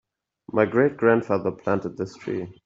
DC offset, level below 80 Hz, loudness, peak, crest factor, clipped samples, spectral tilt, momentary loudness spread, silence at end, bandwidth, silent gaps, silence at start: under 0.1%; -62 dBFS; -24 LUFS; -4 dBFS; 20 dB; under 0.1%; -8 dB/octave; 11 LU; 0.15 s; 7.6 kHz; none; 0.55 s